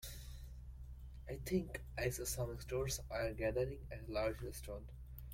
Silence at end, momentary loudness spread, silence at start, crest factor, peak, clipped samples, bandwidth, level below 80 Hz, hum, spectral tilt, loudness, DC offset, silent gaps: 0 s; 15 LU; 0 s; 18 dB; -26 dBFS; under 0.1%; 16.5 kHz; -52 dBFS; none; -5 dB/octave; -42 LUFS; under 0.1%; none